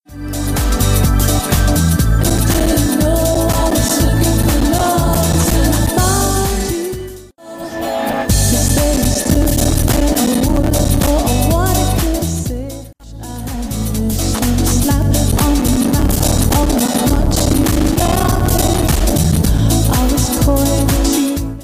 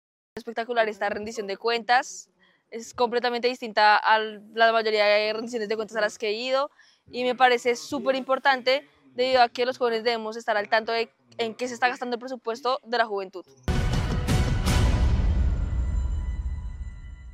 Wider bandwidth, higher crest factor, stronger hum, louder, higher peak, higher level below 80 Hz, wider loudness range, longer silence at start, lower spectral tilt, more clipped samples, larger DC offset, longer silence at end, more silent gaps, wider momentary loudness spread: about the same, 15.5 kHz vs 15 kHz; second, 12 dB vs 20 dB; neither; first, -14 LUFS vs -25 LUFS; about the same, -2 dBFS vs -4 dBFS; first, -18 dBFS vs -32 dBFS; about the same, 3 LU vs 4 LU; second, 0.1 s vs 0.35 s; about the same, -5 dB/octave vs -5 dB/octave; neither; neither; about the same, 0 s vs 0 s; neither; second, 8 LU vs 14 LU